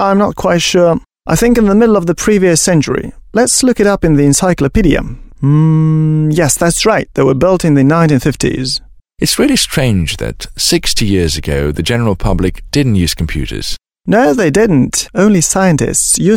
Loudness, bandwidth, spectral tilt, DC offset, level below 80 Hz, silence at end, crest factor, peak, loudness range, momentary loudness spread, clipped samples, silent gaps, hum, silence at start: -11 LUFS; 17 kHz; -4.5 dB/octave; under 0.1%; -26 dBFS; 0 s; 10 dB; 0 dBFS; 3 LU; 8 LU; under 0.1%; none; none; 0 s